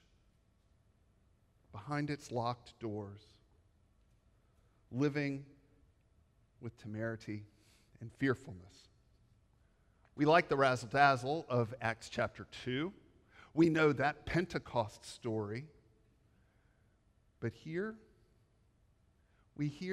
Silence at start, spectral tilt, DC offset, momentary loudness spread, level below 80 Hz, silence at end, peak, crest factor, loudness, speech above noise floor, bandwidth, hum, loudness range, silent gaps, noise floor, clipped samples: 1.75 s; -6.5 dB/octave; under 0.1%; 19 LU; -66 dBFS; 0 s; -14 dBFS; 24 dB; -36 LUFS; 36 dB; 12.5 kHz; none; 12 LU; none; -71 dBFS; under 0.1%